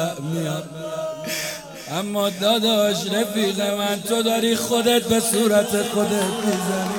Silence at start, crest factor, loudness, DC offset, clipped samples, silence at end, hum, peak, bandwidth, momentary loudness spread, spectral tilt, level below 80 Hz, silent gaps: 0 s; 16 dB; -21 LUFS; under 0.1%; under 0.1%; 0 s; none; -6 dBFS; 18 kHz; 10 LU; -3.5 dB/octave; -58 dBFS; none